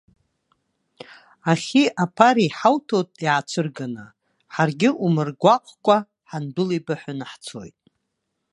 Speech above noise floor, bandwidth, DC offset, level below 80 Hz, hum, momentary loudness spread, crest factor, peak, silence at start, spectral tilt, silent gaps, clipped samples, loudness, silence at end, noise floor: 56 dB; 11 kHz; under 0.1%; -68 dBFS; none; 16 LU; 22 dB; 0 dBFS; 1.45 s; -6 dB/octave; none; under 0.1%; -21 LUFS; 0.85 s; -77 dBFS